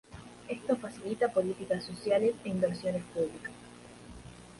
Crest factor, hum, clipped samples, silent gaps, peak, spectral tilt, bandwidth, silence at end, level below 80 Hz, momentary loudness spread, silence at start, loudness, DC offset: 18 dB; 60 Hz at -50 dBFS; under 0.1%; none; -16 dBFS; -6 dB/octave; 11.5 kHz; 0 s; -62 dBFS; 21 LU; 0.1 s; -32 LUFS; under 0.1%